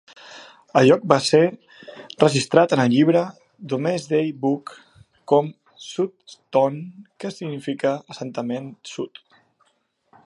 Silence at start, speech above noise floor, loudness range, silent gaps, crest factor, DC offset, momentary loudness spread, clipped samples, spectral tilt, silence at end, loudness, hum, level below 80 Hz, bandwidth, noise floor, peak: 0.25 s; 47 dB; 8 LU; none; 22 dB; under 0.1%; 23 LU; under 0.1%; -5.5 dB/octave; 1.2 s; -21 LUFS; none; -66 dBFS; 11.5 kHz; -68 dBFS; 0 dBFS